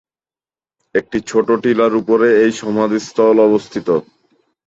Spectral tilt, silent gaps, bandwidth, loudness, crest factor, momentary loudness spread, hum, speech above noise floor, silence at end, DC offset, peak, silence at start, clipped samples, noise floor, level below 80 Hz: -5.5 dB/octave; none; 8 kHz; -15 LUFS; 14 dB; 8 LU; none; over 76 dB; 0.65 s; under 0.1%; -2 dBFS; 0.95 s; under 0.1%; under -90 dBFS; -56 dBFS